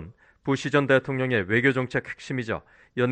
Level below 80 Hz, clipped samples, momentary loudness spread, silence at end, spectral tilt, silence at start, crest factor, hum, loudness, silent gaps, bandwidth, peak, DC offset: -58 dBFS; under 0.1%; 12 LU; 0 s; -6.5 dB/octave; 0 s; 18 dB; none; -25 LUFS; none; 9.2 kHz; -6 dBFS; under 0.1%